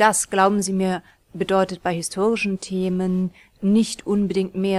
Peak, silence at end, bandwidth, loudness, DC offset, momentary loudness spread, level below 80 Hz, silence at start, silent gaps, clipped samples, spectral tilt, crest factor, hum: -4 dBFS; 0 s; 13.5 kHz; -22 LUFS; under 0.1%; 8 LU; -54 dBFS; 0 s; none; under 0.1%; -5 dB/octave; 18 dB; none